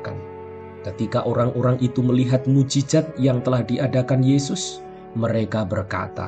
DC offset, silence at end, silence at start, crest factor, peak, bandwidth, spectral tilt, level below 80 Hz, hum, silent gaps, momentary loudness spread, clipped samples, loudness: under 0.1%; 0 s; 0 s; 16 dB; -6 dBFS; 9 kHz; -6.5 dB/octave; -52 dBFS; none; none; 15 LU; under 0.1%; -21 LUFS